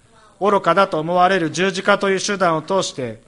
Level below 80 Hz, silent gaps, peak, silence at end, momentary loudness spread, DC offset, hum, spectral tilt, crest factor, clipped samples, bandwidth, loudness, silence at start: -58 dBFS; none; -2 dBFS; 0.1 s; 5 LU; under 0.1%; none; -4 dB/octave; 18 dB; under 0.1%; 11.5 kHz; -18 LUFS; 0.4 s